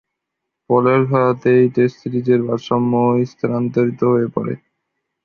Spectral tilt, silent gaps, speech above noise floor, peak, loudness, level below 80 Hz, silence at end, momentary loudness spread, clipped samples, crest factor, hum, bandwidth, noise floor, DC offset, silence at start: -9 dB/octave; none; 63 dB; -2 dBFS; -17 LUFS; -58 dBFS; 0.7 s; 8 LU; under 0.1%; 14 dB; none; 6.8 kHz; -79 dBFS; under 0.1%; 0.7 s